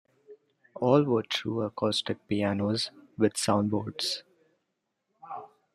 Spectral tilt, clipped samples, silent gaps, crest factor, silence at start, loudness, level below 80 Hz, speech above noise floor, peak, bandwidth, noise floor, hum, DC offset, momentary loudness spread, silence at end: -5 dB/octave; under 0.1%; none; 20 dB; 0.3 s; -28 LUFS; -70 dBFS; 53 dB; -10 dBFS; 14 kHz; -81 dBFS; none; under 0.1%; 12 LU; 0.3 s